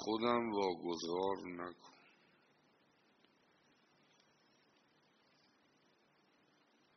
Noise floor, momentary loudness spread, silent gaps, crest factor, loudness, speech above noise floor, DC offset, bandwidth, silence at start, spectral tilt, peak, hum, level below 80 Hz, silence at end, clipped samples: -74 dBFS; 12 LU; none; 26 dB; -39 LUFS; 35 dB; under 0.1%; 6.2 kHz; 0 s; -3.5 dB/octave; -20 dBFS; none; -82 dBFS; 5.05 s; under 0.1%